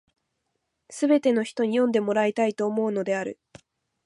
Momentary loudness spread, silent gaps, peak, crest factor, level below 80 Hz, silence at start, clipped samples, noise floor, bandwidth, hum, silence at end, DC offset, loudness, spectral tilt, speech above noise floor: 7 LU; none; -10 dBFS; 16 dB; -74 dBFS; 0.9 s; under 0.1%; -78 dBFS; 11.5 kHz; none; 0.75 s; under 0.1%; -24 LUFS; -5.5 dB/octave; 54 dB